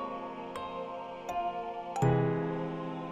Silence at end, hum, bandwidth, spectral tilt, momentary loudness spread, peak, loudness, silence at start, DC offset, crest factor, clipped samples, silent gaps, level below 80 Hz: 0 s; none; 13 kHz; -7.5 dB/octave; 12 LU; -16 dBFS; -34 LUFS; 0 s; under 0.1%; 18 dB; under 0.1%; none; -58 dBFS